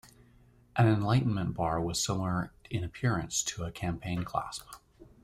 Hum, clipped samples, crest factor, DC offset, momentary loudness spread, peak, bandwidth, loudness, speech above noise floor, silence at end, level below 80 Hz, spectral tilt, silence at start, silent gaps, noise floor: none; under 0.1%; 18 dB; under 0.1%; 10 LU; -14 dBFS; 15.5 kHz; -31 LUFS; 30 dB; 0.2 s; -54 dBFS; -5 dB/octave; 0.05 s; none; -61 dBFS